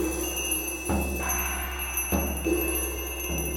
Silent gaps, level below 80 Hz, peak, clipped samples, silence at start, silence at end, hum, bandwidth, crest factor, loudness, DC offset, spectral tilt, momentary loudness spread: none; -34 dBFS; -12 dBFS; under 0.1%; 0 s; 0 s; none; 17 kHz; 18 dB; -28 LUFS; under 0.1%; -3.5 dB/octave; 4 LU